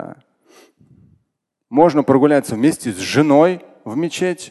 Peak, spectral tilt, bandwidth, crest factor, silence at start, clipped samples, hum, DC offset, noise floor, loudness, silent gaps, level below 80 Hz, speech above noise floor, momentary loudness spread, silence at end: 0 dBFS; -6 dB/octave; 12.5 kHz; 18 dB; 0 s; under 0.1%; none; under 0.1%; -73 dBFS; -16 LUFS; none; -58 dBFS; 58 dB; 11 LU; 0 s